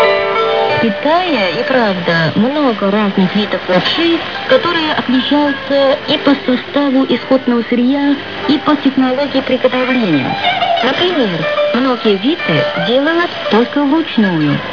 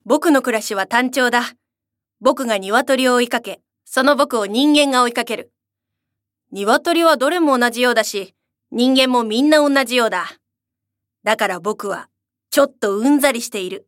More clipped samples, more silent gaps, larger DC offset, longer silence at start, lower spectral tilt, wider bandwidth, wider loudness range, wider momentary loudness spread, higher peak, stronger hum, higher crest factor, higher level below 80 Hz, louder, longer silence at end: neither; neither; first, 0.8% vs under 0.1%; about the same, 0 s vs 0.05 s; first, -6.5 dB/octave vs -2.5 dB/octave; second, 5.4 kHz vs 17 kHz; second, 1 LU vs 4 LU; second, 2 LU vs 12 LU; about the same, 0 dBFS vs 0 dBFS; neither; second, 12 dB vs 18 dB; first, -54 dBFS vs -66 dBFS; first, -13 LUFS vs -16 LUFS; about the same, 0 s vs 0.1 s